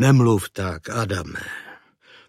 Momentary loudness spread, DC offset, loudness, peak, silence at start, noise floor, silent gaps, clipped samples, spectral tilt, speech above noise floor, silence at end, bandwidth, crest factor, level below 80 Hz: 18 LU; under 0.1%; -22 LUFS; -4 dBFS; 0 s; -52 dBFS; none; under 0.1%; -6.5 dB/octave; 32 dB; 0.55 s; 15 kHz; 18 dB; -50 dBFS